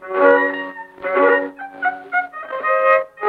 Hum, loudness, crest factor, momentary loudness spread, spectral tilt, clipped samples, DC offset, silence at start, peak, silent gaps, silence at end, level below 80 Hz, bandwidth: none; -17 LUFS; 18 dB; 14 LU; -5.5 dB/octave; under 0.1%; under 0.1%; 0 s; 0 dBFS; none; 0 s; -66 dBFS; 4.7 kHz